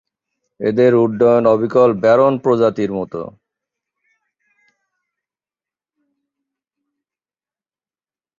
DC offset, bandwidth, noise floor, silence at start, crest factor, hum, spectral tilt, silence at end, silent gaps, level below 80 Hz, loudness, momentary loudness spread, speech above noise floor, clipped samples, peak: under 0.1%; 7.4 kHz; under -90 dBFS; 0.6 s; 16 dB; none; -8.5 dB/octave; 5.1 s; none; -58 dBFS; -14 LUFS; 12 LU; over 76 dB; under 0.1%; -2 dBFS